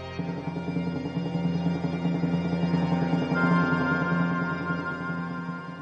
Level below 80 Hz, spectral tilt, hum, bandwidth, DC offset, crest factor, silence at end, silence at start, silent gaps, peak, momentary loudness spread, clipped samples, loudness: -56 dBFS; -8.5 dB/octave; none; 6.8 kHz; under 0.1%; 14 dB; 0 s; 0 s; none; -12 dBFS; 9 LU; under 0.1%; -27 LUFS